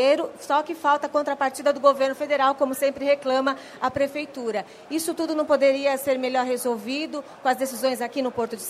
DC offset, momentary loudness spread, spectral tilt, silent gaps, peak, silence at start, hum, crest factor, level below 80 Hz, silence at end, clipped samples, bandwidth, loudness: under 0.1%; 8 LU; -3 dB/octave; none; -6 dBFS; 0 s; none; 18 dB; -68 dBFS; 0 s; under 0.1%; 15.5 kHz; -24 LUFS